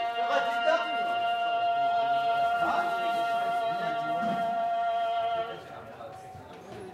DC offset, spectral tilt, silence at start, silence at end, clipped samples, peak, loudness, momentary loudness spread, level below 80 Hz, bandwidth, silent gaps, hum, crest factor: under 0.1%; -4.5 dB/octave; 0 s; 0 s; under 0.1%; -14 dBFS; -28 LUFS; 17 LU; -72 dBFS; 13.5 kHz; none; none; 16 dB